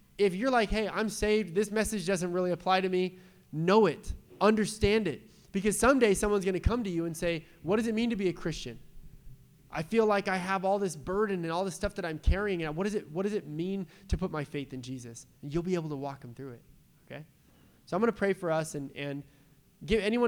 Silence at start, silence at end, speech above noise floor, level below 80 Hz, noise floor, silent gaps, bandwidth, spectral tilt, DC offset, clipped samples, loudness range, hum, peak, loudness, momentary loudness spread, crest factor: 0.2 s; 0 s; 31 dB; -44 dBFS; -61 dBFS; none; 19.5 kHz; -5.5 dB/octave; under 0.1%; under 0.1%; 8 LU; none; -10 dBFS; -30 LUFS; 15 LU; 20 dB